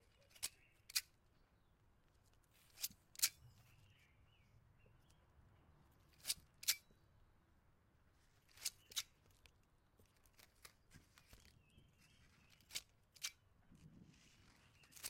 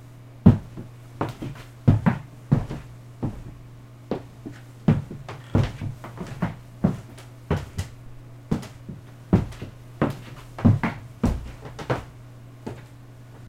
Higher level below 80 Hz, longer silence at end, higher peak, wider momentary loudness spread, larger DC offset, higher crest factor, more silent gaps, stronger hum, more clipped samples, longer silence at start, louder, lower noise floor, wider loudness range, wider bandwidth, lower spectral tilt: second, -76 dBFS vs -40 dBFS; about the same, 0 s vs 0 s; second, -18 dBFS vs 0 dBFS; first, 27 LU vs 23 LU; second, under 0.1% vs 0.1%; first, 36 dB vs 26 dB; neither; neither; neither; first, 0.35 s vs 0 s; second, -45 LUFS vs -26 LUFS; first, -75 dBFS vs -44 dBFS; first, 12 LU vs 4 LU; first, 16.5 kHz vs 14.5 kHz; second, 1 dB/octave vs -8.5 dB/octave